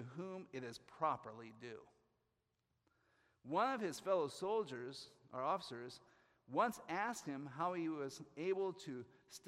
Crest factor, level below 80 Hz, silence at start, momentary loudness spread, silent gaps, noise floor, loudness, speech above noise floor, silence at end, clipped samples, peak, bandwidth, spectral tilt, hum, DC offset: 20 dB; -86 dBFS; 0 s; 15 LU; none; -86 dBFS; -43 LUFS; 43 dB; 0 s; under 0.1%; -24 dBFS; 15.5 kHz; -5 dB/octave; none; under 0.1%